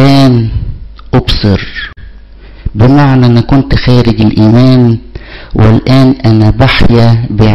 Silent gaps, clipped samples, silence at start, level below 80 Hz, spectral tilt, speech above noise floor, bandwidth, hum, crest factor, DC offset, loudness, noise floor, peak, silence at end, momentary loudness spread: none; under 0.1%; 0 s; -20 dBFS; -8 dB/octave; 25 dB; 8.2 kHz; none; 6 dB; 5%; -7 LUFS; -30 dBFS; 0 dBFS; 0 s; 15 LU